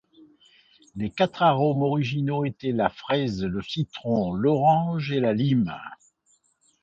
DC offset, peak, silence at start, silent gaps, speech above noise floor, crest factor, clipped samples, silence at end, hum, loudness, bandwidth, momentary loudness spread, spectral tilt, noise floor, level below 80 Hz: under 0.1%; -8 dBFS; 0.95 s; none; 43 dB; 18 dB; under 0.1%; 0.9 s; none; -24 LUFS; 7.8 kHz; 10 LU; -8 dB/octave; -66 dBFS; -56 dBFS